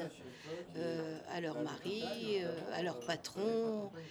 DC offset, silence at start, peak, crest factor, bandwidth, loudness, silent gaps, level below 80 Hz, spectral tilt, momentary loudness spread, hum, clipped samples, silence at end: under 0.1%; 0 s; -22 dBFS; 18 dB; over 20 kHz; -40 LUFS; none; -80 dBFS; -5 dB/octave; 9 LU; none; under 0.1%; 0 s